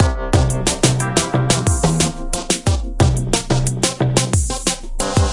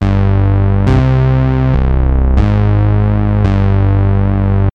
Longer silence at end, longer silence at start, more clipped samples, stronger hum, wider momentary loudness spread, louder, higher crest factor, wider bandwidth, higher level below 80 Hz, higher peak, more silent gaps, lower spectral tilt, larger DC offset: about the same, 0 s vs 0.05 s; about the same, 0 s vs 0 s; neither; neither; about the same, 4 LU vs 2 LU; second, -17 LUFS vs -12 LUFS; first, 16 dB vs 10 dB; first, 11.5 kHz vs 5.2 kHz; second, -26 dBFS vs -16 dBFS; about the same, 0 dBFS vs 0 dBFS; neither; second, -4.5 dB/octave vs -10 dB/octave; neither